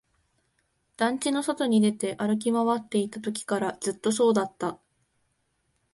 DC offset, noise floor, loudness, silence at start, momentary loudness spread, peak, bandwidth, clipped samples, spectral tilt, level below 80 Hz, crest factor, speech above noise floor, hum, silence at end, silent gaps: under 0.1%; -73 dBFS; -26 LUFS; 1 s; 9 LU; -10 dBFS; 11.5 kHz; under 0.1%; -4.5 dB/octave; -70 dBFS; 16 dB; 48 dB; none; 1.2 s; none